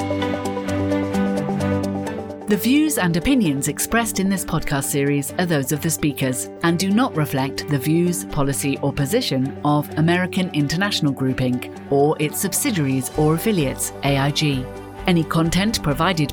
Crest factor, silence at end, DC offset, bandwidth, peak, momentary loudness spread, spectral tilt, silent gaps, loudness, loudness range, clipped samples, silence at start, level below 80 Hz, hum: 16 dB; 0 s; under 0.1%; over 20 kHz; -4 dBFS; 5 LU; -5 dB/octave; none; -20 LUFS; 1 LU; under 0.1%; 0 s; -42 dBFS; none